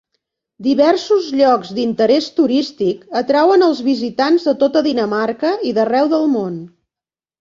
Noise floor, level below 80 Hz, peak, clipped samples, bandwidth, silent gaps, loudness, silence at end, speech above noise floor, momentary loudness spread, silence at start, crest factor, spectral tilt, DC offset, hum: under -90 dBFS; -60 dBFS; 0 dBFS; under 0.1%; 7.6 kHz; none; -15 LUFS; 0.75 s; over 75 dB; 7 LU; 0.6 s; 14 dB; -5.5 dB/octave; under 0.1%; none